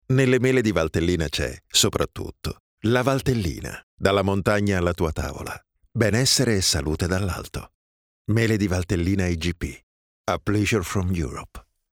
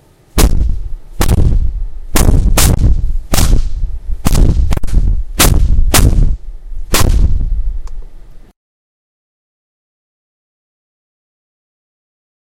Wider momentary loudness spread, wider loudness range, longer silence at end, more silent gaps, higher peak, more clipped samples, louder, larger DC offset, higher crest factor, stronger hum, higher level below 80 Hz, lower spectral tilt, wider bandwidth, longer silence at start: about the same, 15 LU vs 15 LU; second, 3 LU vs 6 LU; second, 0.35 s vs 4.15 s; first, 2.60-2.78 s, 3.83-3.98 s, 7.75-8.25 s, 9.83-10.24 s vs none; about the same, -2 dBFS vs 0 dBFS; second, under 0.1% vs 0.4%; second, -23 LUFS vs -14 LUFS; neither; first, 20 dB vs 12 dB; neither; second, -42 dBFS vs -14 dBFS; about the same, -4.5 dB/octave vs -4.5 dB/octave; first, 19 kHz vs 17 kHz; second, 0.1 s vs 0.35 s